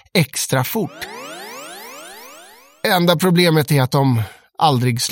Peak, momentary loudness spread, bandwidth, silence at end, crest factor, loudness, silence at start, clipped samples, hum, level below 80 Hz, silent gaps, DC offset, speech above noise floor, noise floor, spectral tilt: 0 dBFS; 20 LU; 17 kHz; 0 s; 18 dB; -17 LUFS; 0.15 s; under 0.1%; none; -56 dBFS; none; under 0.1%; 28 dB; -44 dBFS; -5 dB/octave